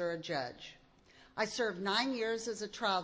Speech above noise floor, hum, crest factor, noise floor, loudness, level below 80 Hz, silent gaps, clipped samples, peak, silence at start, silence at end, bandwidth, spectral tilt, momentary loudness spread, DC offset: 27 dB; none; 18 dB; -63 dBFS; -36 LUFS; -72 dBFS; none; under 0.1%; -18 dBFS; 0 s; 0 s; 8 kHz; -3 dB/octave; 14 LU; under 0.1%